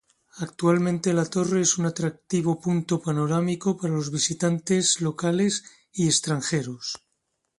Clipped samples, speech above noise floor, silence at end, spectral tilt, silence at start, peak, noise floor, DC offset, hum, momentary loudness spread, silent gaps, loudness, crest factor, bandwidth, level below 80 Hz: under 0.1%; 52 dB; 0.65 s; -4.5 dB/octave; 0.35 s; -8 dBFS; -76 dBFS; under 0.1%; none; 9 LU; none; -24 LUFS; 16 dB; 11.5 kHz; -64 dBFS